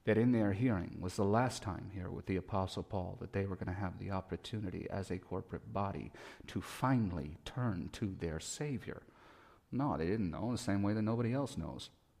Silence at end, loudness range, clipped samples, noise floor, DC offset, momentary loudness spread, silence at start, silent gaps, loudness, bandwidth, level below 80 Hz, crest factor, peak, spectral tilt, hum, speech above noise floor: 0.3 s; 4 LU; under 0.1%; -62 dBFS; under 0.1%; 11 LU; 0.05 s; none; -38 LUFS; 15.5 kHz; -58 dBFS; 18 dB; -20 dBFS; -6.5 dB/octave; none; 25 dB